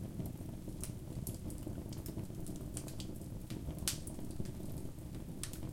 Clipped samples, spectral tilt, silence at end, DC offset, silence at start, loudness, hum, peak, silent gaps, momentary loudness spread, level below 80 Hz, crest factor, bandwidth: under 0.1%; -5 dB/octave; 0 s; under 0.1%; 0 s; -45 LUFS; none; -12 dBFS; none; 7 LU; -52 dBFS; 32 dB; 17 kHz